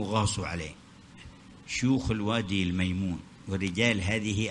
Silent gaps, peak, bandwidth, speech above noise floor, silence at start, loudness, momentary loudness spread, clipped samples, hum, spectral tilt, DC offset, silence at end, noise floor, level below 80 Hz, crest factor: none; -10 dBFS; 11 kHz; 21 dB; 0 s; -29 LUFS; 23 LU; under 0.1%; none; -5 dB/octave; under 0.1%; 0 s; -50 dBFS; -50 dBFS; 20 dB